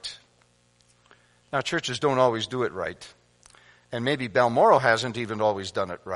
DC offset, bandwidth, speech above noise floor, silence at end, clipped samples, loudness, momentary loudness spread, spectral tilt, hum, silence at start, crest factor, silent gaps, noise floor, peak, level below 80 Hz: under 0.1%; 11.5 kHz; 39 dB; 0 s; under 0.1%; -24 LUFS; 15 LU; -4.5 dB/octave; 60 Hz at -55 dBFS; 0.05 s; 22 dB; none; -63 dBFS; -4 dBFS; -64 dBFS